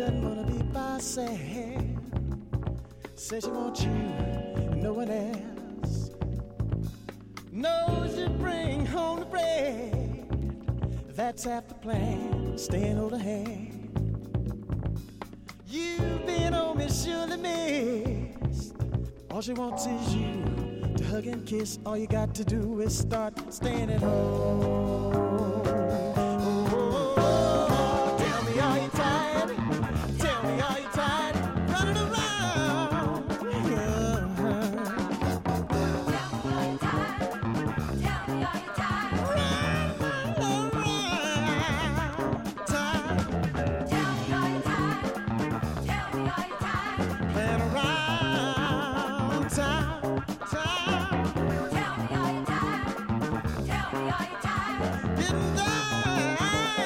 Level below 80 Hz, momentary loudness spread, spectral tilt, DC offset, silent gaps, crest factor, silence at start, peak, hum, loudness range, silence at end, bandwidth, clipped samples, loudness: -42 dBFS; 7 LU; -5.5 dB/octave; under 0.1%; none; 18 dB; 0 s; -12 dBFS; none; 6 LU; 0 s; 16.5 kHz; under 0.1%; -29 LUFS